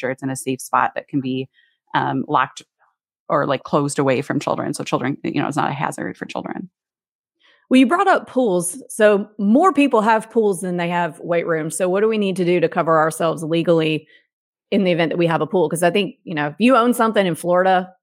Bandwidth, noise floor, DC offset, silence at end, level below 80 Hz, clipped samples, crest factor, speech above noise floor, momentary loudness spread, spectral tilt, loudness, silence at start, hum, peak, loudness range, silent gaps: 16.5 kHz; -65 dBFS; under 0.1%; 0.1 s; -74 dBFS; under 0.1%; 16 dB; 46 dB; 10 LU; -5.5 dB/octave; -19 LUFS; 0 s; none; -2 dBFS; 5 LU; 3.20-3.26 s, 7.11-7.24 s, 14.33-14.53 s